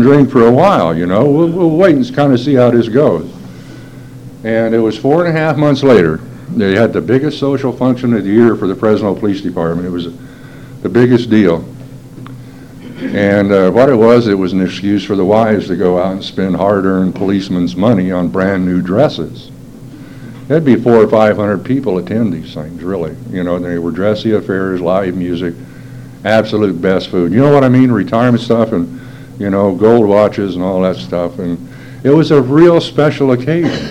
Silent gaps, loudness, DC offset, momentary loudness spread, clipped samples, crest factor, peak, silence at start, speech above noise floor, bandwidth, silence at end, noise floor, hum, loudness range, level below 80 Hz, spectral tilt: none; -12 LUFS; 0.5%; 20 LU; 0.6%; 12 dB; 0 dBFS; 0 s; 21 dB; 12.5 kHz; 0 s; -32 dBFS; none; 4 LU; -44 dBFS; -8 dB/octave